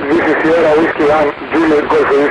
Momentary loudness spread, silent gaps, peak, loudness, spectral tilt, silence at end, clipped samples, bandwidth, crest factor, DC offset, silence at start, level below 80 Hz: 4 LU; none; -2 dBFS; -11 LUFS; -6 dB/octave; 0 s; under 0.1%; 10.5 kHz; 8 dB; under 0.1%; 0 s; -42 dBFS